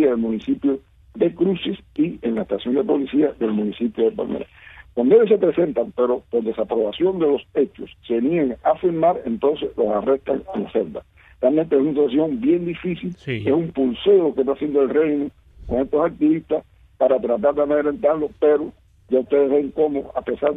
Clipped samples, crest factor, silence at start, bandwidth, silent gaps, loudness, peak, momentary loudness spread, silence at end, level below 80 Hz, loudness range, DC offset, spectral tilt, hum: under 0.1%; 16 dB; 0 s; 4 kHz; none; -20 LUFS; -4 dBFS; 8 LU; 0 s; -50 dBFS; 2 LU; under 0.1%; -9.5 dB/octave; none